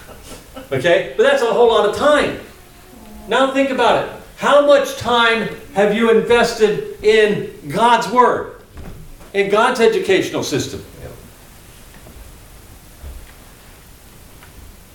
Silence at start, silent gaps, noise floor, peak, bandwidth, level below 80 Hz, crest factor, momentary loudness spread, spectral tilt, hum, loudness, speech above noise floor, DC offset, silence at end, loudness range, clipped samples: 0 s; none; -42 dBFS; 0 dBFS; 18 kHz; -44 dBFS; 16 dB; 23 LU; -4 dB/octave; none; -15 LUFS; 27 dB; under 0.1%; 0.35 s; 5 LU; under 0.1%